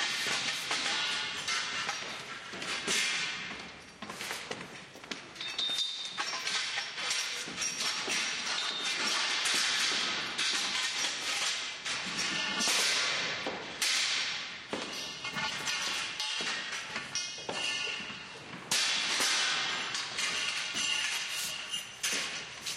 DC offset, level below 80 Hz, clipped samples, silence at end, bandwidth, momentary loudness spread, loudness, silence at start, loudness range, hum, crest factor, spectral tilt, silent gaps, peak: under 0.1%; -72 dBFS; under 0.1%; 0 s; 16 kHz; 11 LU; -31 LUFS; 0 s; 5 LU; none; 20 dB; 0.5 dB/octave; none; -14 dBFS